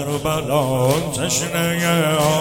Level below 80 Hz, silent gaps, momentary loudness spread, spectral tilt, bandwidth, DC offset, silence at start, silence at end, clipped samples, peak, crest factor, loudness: -44 dBFS; none; 3 LU; -4.5 dB/octave; 17 kHz; under 0.1%; 0 s; 0 s; under 0.1%; -2 dBFS; 16 dB; -19 LUFS